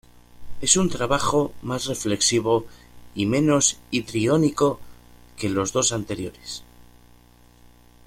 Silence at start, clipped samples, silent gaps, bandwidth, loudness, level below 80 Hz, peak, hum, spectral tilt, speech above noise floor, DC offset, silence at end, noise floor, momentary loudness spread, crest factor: 0.4 s; under 0.1%; none; 16 kHz; -22 LUFS; -48 dBFS; -2 dBFS; 60 Hz at -50 dBFS; -3.5 dB/octave; 30 dB; under 0.1%; 1.25 s; -52 dBFS; 13 LU; 22 dB